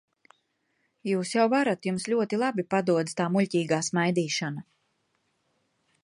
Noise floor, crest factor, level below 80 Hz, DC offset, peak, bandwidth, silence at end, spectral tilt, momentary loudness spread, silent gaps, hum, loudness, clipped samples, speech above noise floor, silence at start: -74 dBFS; 18 dB; -74 dBFS; under 0.1%; -10 dBFS; 11.5 kHz; 1.4 s; -5 dB/octave; 6 LU; none; none; -26 LUFS; under 0.1%; 48 dB; 1.05 s